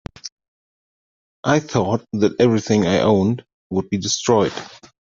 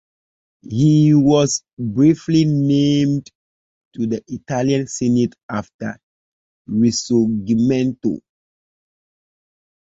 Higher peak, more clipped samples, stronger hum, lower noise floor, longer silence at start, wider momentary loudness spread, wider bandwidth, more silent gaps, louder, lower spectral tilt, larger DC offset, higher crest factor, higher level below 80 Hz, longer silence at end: about the same, -2 dBFS vs -2 dBFS; neither; neither; about the same, under -90 dBFS vs under -90 dBFS; second, 0.25 s vs 0.7 s; first, 17 LU vs 13 LU; about the same, 7.8 kHz vs 8 kHz; second, 0.32-0.37 s, 0.48-1.43 s, 3.54-3.70 s vs 1.73-1.77 s, 3.35-3.91 s, 5.43-5.49 s, 5.74-5.79 s, 6.03-6.65 s; about the same, -19 LUFS vs -17 LUFS; about the same, -5.5 dB/octave vs -6.5 dB/octave; neither; about the same, 18 dB vs 16 dB; about the same, -54 dBFS vs -54 dBFS; second, 0.45 s vs 1.7 s